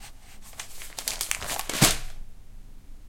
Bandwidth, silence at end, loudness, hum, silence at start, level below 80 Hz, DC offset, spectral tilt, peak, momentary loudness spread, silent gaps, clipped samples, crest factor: 17 kHz; 0 s; -26 LUFS; none; 0 s; -40 dBFS; under 0.1%; -2 dB/octave; -2 dBFS; 22 LU; none; under 0.1%; 30 dB